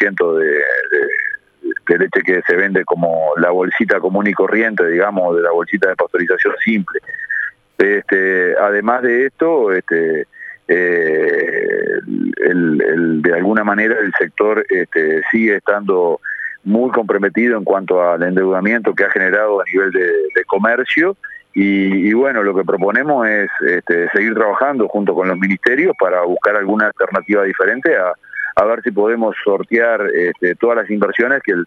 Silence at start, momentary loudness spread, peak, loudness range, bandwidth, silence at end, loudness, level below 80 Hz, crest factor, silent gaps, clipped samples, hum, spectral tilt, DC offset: 0 s; 4 LU; 0 dBFS; 1 LU; 6.4 kHz; 0 s; -15 LUFS; -62 dBFS; 14 dB; none; under 0.1%; none; -8 dB/octave; under 0.1%